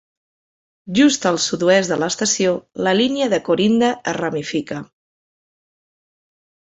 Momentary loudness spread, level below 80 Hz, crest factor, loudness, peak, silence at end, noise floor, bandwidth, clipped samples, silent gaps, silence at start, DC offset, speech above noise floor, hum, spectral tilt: 8 LU; -60 dBFS; 18 dB; -18 LUFS; -2 dBFS; 1.9 s; under -90 dBFS; 8.4 kHz; under 0.1%; none; 0.85 s; under 0.1%; over 72 dB; none; -3.5 dB/octave